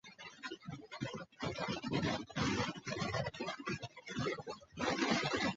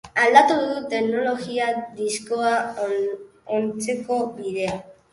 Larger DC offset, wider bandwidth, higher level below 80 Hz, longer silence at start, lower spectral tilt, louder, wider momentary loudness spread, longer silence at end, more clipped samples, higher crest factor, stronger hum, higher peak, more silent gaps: neither; second, 8 kHz vs 11.5 kHz; about the same, -62 dBFS vs -62 dBFS; about the same, 0.05 s vs 0.05 s; about the same, -3.5 dB/octave vs -3.5 dB/octave; second, -39 LUFS vs -22 LUFS; about the same, 13 LU vs 12 LU; second, 0 s vs 0.2 s; neither; about the same, 20 dB vs 20 dB; neither; second, -20 dBFS vs -2 dBFS; neither